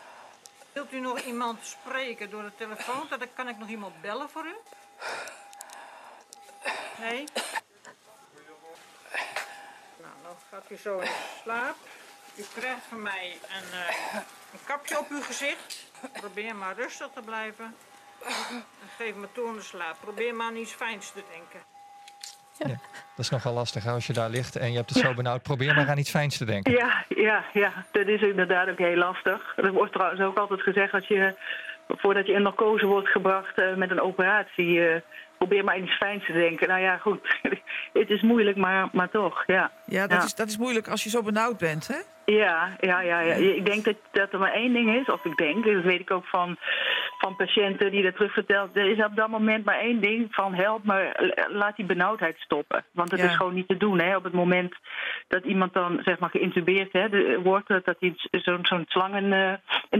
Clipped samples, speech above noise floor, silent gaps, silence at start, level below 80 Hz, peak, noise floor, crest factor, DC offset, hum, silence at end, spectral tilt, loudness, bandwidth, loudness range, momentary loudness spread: under 0.1%; 29 dB; none; 0 s; -72 dBFS; -8 dBFS; -55 dBFS; 18 dB; under 0.1%; none; 0 s; -5 dB/octave; -26 LUFS; 16 kHz; 13 LU; 15 LU